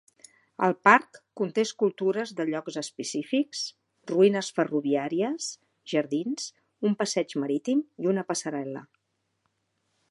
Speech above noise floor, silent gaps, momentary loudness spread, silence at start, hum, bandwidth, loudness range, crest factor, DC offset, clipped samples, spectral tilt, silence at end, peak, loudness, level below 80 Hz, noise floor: 50 dB; none; 13 LU; 0.6 s; none; 11.5 kHz; 4 LU; 26 dB; under 0.1%; under 0.1%; -4.5 dB/octave; 1.25 s; -2 dBFS; -27 LUFS; -82 dBFS; -76 dBFS